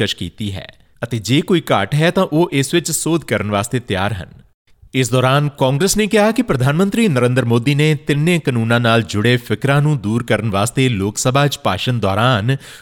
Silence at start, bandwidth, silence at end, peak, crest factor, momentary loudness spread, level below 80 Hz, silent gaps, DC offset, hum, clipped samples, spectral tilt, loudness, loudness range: 0 s; 18 kHz; 0.05 s; -2 dBFS; 14 dB; 6 LU; -46 dBFS; 4.54-4.65 s; under 0.1%; none; under 0.1%; -5 dB/octave; -16 LUFS; 3 LU